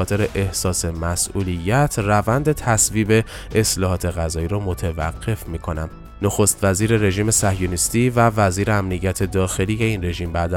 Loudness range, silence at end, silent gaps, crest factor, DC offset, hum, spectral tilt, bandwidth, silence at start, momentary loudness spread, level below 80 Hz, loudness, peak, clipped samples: 4 LU; 0 s; none; 16 dB; under 0.1%; none; -4.5 dB/octave; 17.5 kHz; 0 s; 8 LU; -34 dBFS; -20 LUFS; -2 dBFS; under 0.1%